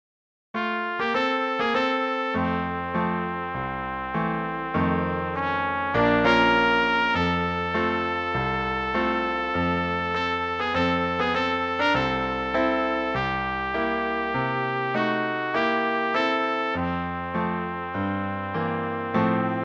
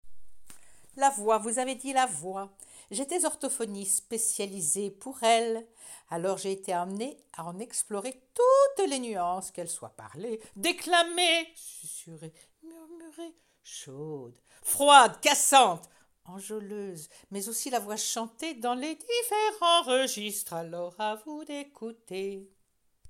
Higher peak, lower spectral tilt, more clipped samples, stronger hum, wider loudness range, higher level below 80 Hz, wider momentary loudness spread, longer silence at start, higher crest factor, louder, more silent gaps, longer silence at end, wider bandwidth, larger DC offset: second, -8 dBFS vs -4 dBFS; first, -6.5 dB/octave vs -1.5 dB/octave; neither; neither; second, 4 LU vs 9 LU; first, -48 dBFS vs -72 dBFS; second, 7 LU vs 20 LU; first, 0.55 s vs 0.05 s; second, 16 dB vs 26 dB; first, -24 LUFS vs -27 LUFS; neither; about the same, 0 s vs 0 s; second, 8 kHz vs 17 kHz; neither